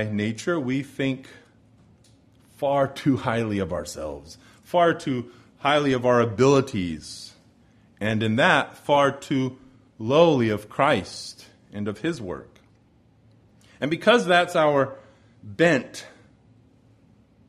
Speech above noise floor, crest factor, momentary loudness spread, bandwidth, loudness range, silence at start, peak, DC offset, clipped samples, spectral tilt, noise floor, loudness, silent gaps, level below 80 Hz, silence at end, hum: 36 dB; 22 dB; 17 LU; 13.5 kHz; 6 LU; 0 s; -4 dBFS; under 0.1%; under 0.1%; -5.5 dB/octave; -58 dBFS; -23 LUFS; none; -58 dBFS; 1.4 s; none